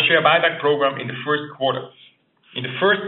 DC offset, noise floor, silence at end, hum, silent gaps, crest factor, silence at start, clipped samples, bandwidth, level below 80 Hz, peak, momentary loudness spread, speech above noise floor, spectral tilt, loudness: under 0.1%; -53 dBFS; 0 s; none; none; 18 dB; 0 s; under 0.1%; 4.2 kHz; -70 dBFS; -2 dBFS; 15 LU; 34 dB; -1.5 dB/octave; -20 LUFS